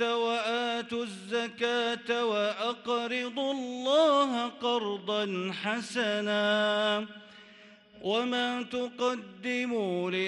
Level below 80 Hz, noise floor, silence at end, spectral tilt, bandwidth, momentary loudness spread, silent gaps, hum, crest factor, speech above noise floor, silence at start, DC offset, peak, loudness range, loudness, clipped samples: -78 dBFS; -55 dBFS; 0 s; -4 dB/octave; 11.5 kHz; 7 LU; none; none; 16 dB; 25 dB; 0 s; under 0.1%; -14 dBFS; 3 LU; -30 LUFS; under 0.1%